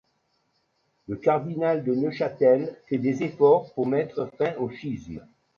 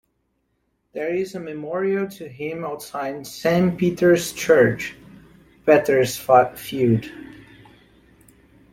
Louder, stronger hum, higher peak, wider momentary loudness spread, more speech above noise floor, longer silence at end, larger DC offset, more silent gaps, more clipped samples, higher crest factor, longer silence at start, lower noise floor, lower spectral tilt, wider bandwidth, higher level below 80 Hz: second, -25 LUFS vs -21 LUFS; neither; second, -6 dBFS vs -2 dBFS; about the same, 14 LU vs 14 LU; about the same, 47 dB vs 50 dB; second, 0.35 s vs 1.3 s; neither; neither; neither; about the same, 18 dB vs 20 dB; first, 1.1 s vs 0.95 s; about the same, -71 dBFS vs -70 dBFS; first, -8.5 dB/octave vs -5.5 dB/octave; second, 7 kHz vs 16.5 kHz; second, -62 dBFS vs -56 dBFS